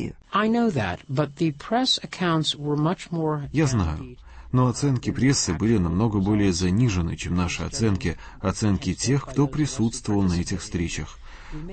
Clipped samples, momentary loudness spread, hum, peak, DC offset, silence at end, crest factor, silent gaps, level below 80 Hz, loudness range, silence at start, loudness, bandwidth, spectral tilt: under 0.1%; 7 LU; none; -8 dBFS; under 0.1%; 0 s; 16 dB; none; -40 dBFS; 2 LU; 0 s; -24 LUFS; 8.8 kHz; -5.5 dB/octave